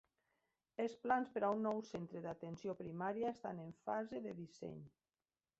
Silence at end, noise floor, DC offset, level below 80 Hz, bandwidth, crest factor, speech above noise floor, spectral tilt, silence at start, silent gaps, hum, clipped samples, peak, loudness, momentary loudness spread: 0.7 s; under -90 dBFS; under 0.1%; -80 dBFS; 8 kHz; 20 dB; over 47 dB; -6 dB/octave; 0.8 s; none; none; under 0.1%; -24 dBFS; -44 LUFS; 13 LU